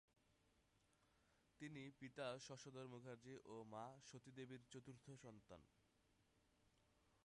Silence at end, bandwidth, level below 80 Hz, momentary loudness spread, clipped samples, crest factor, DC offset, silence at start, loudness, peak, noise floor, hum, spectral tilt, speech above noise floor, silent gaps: 0.05 s; 11 kHz; -86 dBFS; 11 LU; under 0.1%; 22 dB; under 0.1%; 0.25 s; -59 LUFS; -38 dBFS; -82 dBFS; none; -5 dB/octave; 24 dB; none